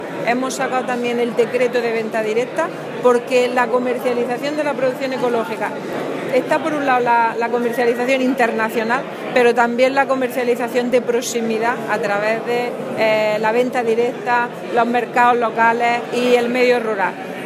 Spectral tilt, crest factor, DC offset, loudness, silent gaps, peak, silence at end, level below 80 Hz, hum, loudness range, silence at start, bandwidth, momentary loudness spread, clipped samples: -4.5 dB/octave; 16 dB; under 0.1%; -18 LUFS; none; 0 dBFS; 0 s; -72 dBFS; none; 2 LU; 0 s; 15.5 kHz; 6 LU; under 0.1%